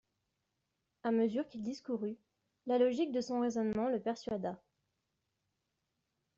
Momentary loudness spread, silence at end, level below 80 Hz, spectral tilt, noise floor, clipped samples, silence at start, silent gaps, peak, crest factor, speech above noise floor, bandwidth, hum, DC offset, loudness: 11 LU; 1.8 s; -74 dBFS; -5.5 dB/octave; -85 dBFS; under 0.1%; 1.05 s; none; -20 dBFS; 18 dB; 50 dB; 7.6 kHz; none; under 0.1%; -36 LUFS